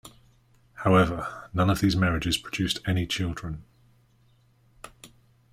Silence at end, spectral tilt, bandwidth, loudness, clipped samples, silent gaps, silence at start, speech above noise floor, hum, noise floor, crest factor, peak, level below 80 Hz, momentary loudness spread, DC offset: 0.45 s; -5.5 dB/octave; 15.5 kHz; -26 LUFS; under 0.1%; none; 0.05 s; 37 dB; none; -62 dBFS; 20 dB; -8 dBFS; -46 dBFS; 23 LU; under 0.1%